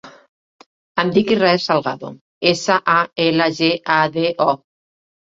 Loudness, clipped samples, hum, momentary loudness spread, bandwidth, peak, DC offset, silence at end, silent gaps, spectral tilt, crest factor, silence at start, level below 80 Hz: -17 LUFS; under 0.1%; none; 10 LU; 7.8 kHz; -2 dBFS; under 0.1%; 0.65 s; 0.29-0.59 s, 0.66-0.95 s, 2.21-2.41 s; -5 dB/octave; 16 dB; 0.05 s; -60 dBFS